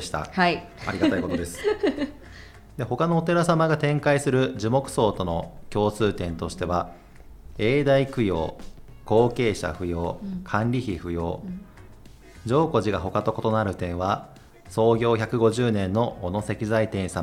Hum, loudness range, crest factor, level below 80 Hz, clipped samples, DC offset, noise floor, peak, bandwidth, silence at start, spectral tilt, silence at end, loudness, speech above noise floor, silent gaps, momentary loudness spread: none; 4 LU; 18 dB; -46 dBFS; under 0.1%; under 0.1%; -46 dBFS; -6 dBFS; 15.5 kHz; 0 s; -6.5 dB/octave; 0 s; -24 LUFS; 22 dB; none; 10 LU